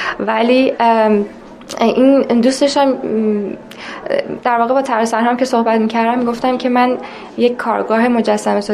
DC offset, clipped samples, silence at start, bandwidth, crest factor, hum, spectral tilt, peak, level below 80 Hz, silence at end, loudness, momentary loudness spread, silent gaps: under 0.1%; under 0.1%; 0 s; 12.5 kHz; 14 dB; none; -5 dB/octave; -2 dBFS; -54 dBFS; 0 s; -14 LUFS; 9 LU; none